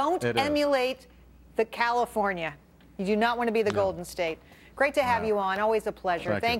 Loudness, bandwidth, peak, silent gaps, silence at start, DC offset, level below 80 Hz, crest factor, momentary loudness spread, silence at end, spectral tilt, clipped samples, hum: -27 LUFS; 16.5 kHz; -10 dBFS; none; 0 s; under 0.1%; -56 dBFS; 18 dB; 9 LU; 0 s; -5 dB/octave; under 0.1%; none